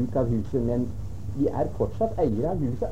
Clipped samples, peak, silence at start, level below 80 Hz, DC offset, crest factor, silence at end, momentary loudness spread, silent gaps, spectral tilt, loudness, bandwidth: under 0.1%; -10 dBFS; 0 s; -40 dBFS; 2%; 16 dB; 0 s; 6 LU; none; -10 dB/octave; -27 LUFS; 13 kHz